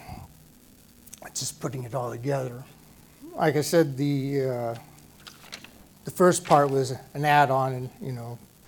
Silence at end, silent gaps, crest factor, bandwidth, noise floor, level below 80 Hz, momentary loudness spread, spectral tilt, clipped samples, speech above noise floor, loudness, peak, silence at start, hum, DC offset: 0.3 s; none; 22 dB; 18 kHz; -54 dBFS; -60 dBFS; 23 LU; -5.5 dB/octave; under 0.1%; 29 dB; -25 LUFS; -4 dBFS; 0 s; none; under 0.1%